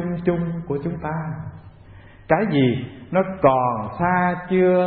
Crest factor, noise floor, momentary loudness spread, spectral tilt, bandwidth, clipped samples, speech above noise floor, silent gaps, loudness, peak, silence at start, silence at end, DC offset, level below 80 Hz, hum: 20 dB; -45 dBFS; 11 LU; -12 dB/octave; 4.4 kHz; under 0.1%; 24 dB; none; -21 LUFS; -2 dBFS; 0 s; 0 s; under 0.1%; -48 dBFS; none